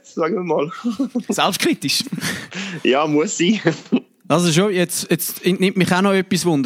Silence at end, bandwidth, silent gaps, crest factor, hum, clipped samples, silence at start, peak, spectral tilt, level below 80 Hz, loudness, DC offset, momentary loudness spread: 0 s; 16.5 kHz; none; 18 dB; none; under 0.1%; 0.1 s; -2 dBFS; -4.5 dB/octave; -62 dBFS; -19 LUFS; under 0.1%; 7 LU